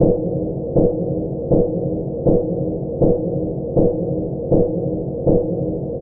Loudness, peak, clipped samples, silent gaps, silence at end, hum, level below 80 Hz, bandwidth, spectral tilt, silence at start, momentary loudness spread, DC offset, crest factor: -20 LUFS; -2 dBFS; under 0.1%; none; 0 s; none; -34 dBFS; 1.5 kHz; -18 dB/octave; 0 s; 6 LU; under 0.1%; 16 dB